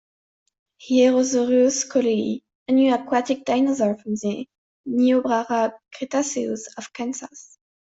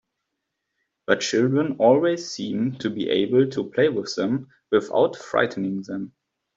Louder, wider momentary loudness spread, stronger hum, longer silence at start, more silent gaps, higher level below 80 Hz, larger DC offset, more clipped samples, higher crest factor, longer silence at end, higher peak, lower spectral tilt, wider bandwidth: about the same, -21 LUFS vs -23 LUFS; first, 15 LU vs 10 LU; neither; second, 0.8 s vs 1.1 s; first, 2.55-2.66 s, 4.58-4.84 s vs none; about the same, -68 dBFS vs -66 dBFS; neither; neither; about the same, 16 dB vs 20 dB; about the same, 0.4 s vs 0.5 s; about the same, -6 dBFS vs -4 dBFS; second, -4 dB/octave vs -5.5 dB/octave; about the same, 8 kHz vs 7.8 kHz